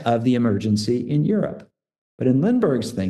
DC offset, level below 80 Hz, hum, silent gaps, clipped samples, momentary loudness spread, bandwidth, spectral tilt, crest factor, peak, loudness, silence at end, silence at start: 0.1%; -60 dBFS; none; 1.98-2.18 s; under 0.1%; 6 LU; 12.5 kHz; -7.5 dB/octave; 14 dB; -6 dBFS; -21 LUFS; 0 s; 0 s